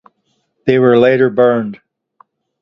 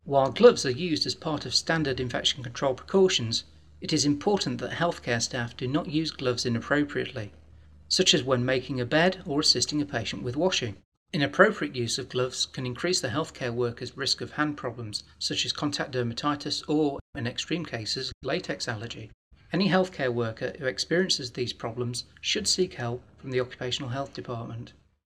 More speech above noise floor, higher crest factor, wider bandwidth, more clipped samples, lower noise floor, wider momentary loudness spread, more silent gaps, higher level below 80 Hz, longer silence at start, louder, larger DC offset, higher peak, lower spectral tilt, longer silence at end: first, 54 dB vs 25 dB; second, 14 dB vs 24 dB; second, 6 kHz vs 15.5 kHz; neither; first, -65 dBFS vs -53 dBFS; about the same, 11 LU vs 11 LU; second, none vs 10.85-11.06 s, 17.01-17.13 s, 18.14-18.21 s, 19.14-19.31 s; about the same, -58 dBFS vs -58 dBFS; first, 0.65 s vs 0.05 s; first, -12 LUFS vs -27 LUFS; neither; first, 0 dBFS vs -4 dBFS; first, -9 dB/octave vs -4 dB/octave; first, 0.85 s vs 0.35 s